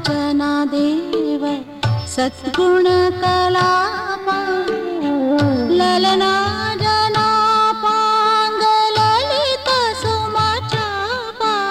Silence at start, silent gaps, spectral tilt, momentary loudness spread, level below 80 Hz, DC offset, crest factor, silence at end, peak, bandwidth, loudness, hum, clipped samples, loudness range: 0 s; none; -5 dB/octave; 7 LU; -46 dBFS; under 0.1%; 12 dB; 0 s; -6 dBFS; 15.5 kHz; -16 LUFS; none; under 0.1%; 2 LU